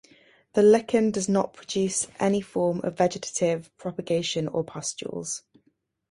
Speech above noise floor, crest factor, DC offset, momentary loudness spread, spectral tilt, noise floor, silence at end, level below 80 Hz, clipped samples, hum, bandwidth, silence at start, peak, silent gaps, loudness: 45 dB; 18 dB; under 0.1%; 12 LU; -4.5 dB/octave; -69 dBFS; 0.7 s; -64 dBFS; under 0.1%; none; 11.5 kHz; 0.55 s; -8 dBFS; none; -26 LUFS